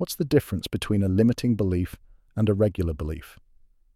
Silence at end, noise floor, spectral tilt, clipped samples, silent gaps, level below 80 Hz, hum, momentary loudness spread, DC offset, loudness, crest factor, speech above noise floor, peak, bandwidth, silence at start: 0.65 s; -57 dBFS; -7 dB/octave; under 0.1%; none; -42 dBFS; none; 12 LU; under 0.1%; -25 LUFS; 18 dB; 33 dB; -6 dBFS; 15.5 kHz; 0 s